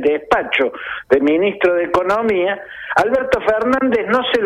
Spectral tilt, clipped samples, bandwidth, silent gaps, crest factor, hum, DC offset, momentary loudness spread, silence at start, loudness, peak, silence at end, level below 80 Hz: -5.5 dB/octave; under 0.1%; 13 kHz; none; 16 dB; none; under 0.1%; 4 LU; 0 s; -16 LUFS; 0 dBFS; 0 s; -46 dBFS